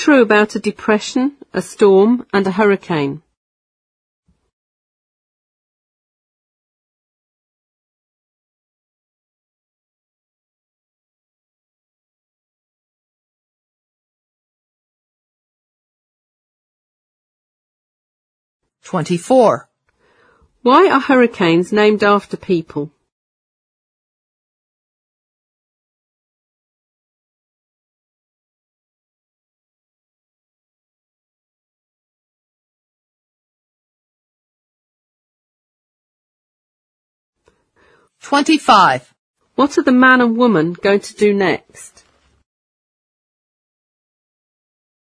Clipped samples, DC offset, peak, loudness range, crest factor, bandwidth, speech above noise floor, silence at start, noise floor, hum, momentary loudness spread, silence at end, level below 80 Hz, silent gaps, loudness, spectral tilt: under 0.1%; under 0.1%; 0 dBFS; 13 LU; 20 dB; 11 kHz; 46 dB; 0 s; -59 dBFS; none; 13 LU; 3.2 s; -64 dBFS; 3.37-4.23 s, 4.53-18.60 s, 23.12-37.33 s, 39.18-39.34 s; -14 LUFS; -5.5 dB/octave